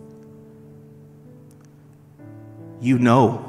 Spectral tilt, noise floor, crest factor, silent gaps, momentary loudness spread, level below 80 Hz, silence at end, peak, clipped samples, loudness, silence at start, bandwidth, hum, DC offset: -7.5 dB/octave; -48 dBFS; 22 dB; none; 28 LU; -66 dBFS; 0 s; -2 dBFS; under 0.1%; -18 LUFS; 2.35 s; 11.5 kHz; none; under 0.1%